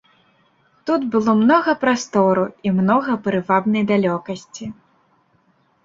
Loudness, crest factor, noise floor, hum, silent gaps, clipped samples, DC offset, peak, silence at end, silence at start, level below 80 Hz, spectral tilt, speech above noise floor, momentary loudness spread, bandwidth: -18 LUFS; 16 dB; -60 dBFS; none; none; under 0.1%; under 0.1%; -2 dBFS; 1.15 s; 0.85 s; -60 dBFS; -6.5 dB/octave; 43 dB; 16 LU; 7.8 kHz